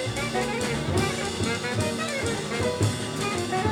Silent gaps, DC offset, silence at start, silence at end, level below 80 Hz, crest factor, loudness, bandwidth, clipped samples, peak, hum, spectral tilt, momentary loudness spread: none; under 0.1%; 0 s; 0 s; -46 dBFS; 14 dB; -27 LUFS; 20 kHz; under 0.1%; -12 dBFS; none; -4.5 dB/octave; 2 LU